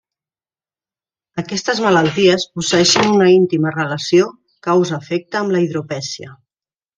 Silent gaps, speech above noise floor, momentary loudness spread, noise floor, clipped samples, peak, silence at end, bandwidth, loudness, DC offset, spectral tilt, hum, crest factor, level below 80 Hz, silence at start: none; over 75 dB; 13 LU; under -90 dBFS; under 0.1%; 0 dBFS; 0.65 s; 9.4 kHz; -15 LUFS; under 0.1%; -4.5 dB/octave; none; 16 dB; -58 dBFS; 1.35 s